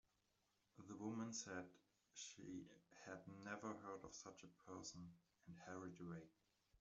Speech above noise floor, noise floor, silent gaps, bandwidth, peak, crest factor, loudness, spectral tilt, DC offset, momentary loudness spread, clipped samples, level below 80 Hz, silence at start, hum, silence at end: 30 dB; -86 dBFS; none; 8 kHz; -36 dBFS; 22 dB; -56 LUFS; -4.5 dB/octave; under 0.1%; 14 LU; under 0.1%; -86 dBFS; 0.75 s; none; 0.05 s